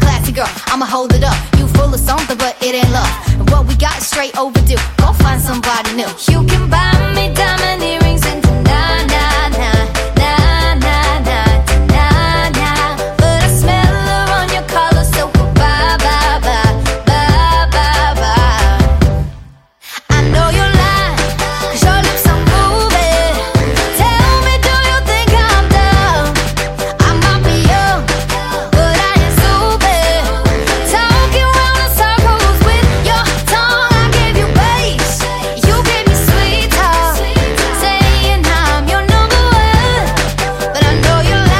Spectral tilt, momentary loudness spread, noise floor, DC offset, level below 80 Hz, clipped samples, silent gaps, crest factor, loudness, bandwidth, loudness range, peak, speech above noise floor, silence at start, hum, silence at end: -4.5 dB/octave; 5 LU; -36 dBFS; under 0.1%; -16 dBFS; under 0.1%; none; 10 dB; -11 LUFS; 16.5 kHz; 2 LU; 0 dBFS; 25 dB; 0 s; none; 0 s